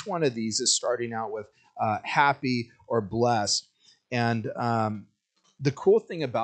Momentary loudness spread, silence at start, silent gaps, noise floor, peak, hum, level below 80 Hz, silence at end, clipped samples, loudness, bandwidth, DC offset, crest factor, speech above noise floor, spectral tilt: 9 LU; 0 s; none; -69 dBFS; -6 dBFS; none; -68 dBFS; 0 s; under 0.1%; -26 LUFS; 9.4 kHz; under 0.1%; 22 dB; 43 dB; -4 dB/octave